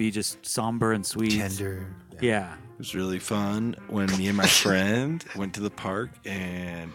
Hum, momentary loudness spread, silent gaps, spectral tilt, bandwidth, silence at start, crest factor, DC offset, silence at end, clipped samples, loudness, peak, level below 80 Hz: none; 14 LU; none; -4 dB/octave; 17.5 kHz; 0 s; 24 dB; under 0.1%; 0 s; under 0.1%; -26 LUFS; -4 dBFS; -56 dBFS